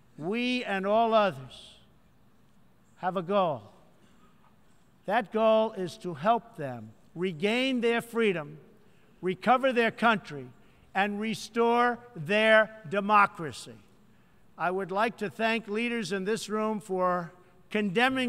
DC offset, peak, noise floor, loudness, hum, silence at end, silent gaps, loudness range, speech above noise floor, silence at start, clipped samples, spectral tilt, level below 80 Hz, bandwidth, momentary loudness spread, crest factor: under 0.1%; -8 dBFS; -63 dBFS; -28 LUFS; none; 0 s; none; 5 LU; 35 dB; 0.2 s; under 0.1%; -5 dB/octave; -70 dBFS; 15 kHz; 15 LU; 20 dB